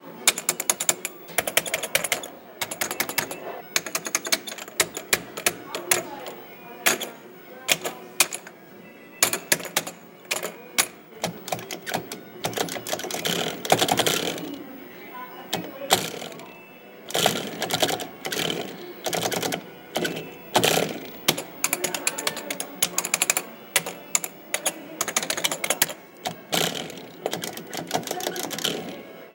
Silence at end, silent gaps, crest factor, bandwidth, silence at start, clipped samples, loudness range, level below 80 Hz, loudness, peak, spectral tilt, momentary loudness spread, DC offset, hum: 0 s; none; 28 dB; 17 kHz; 0 s; under 0.1%; 3 LU; -66 dBFS; -25 LUFS; 0 dBFS; -1.5 dB/octave; 15 LU; under 0.1%; none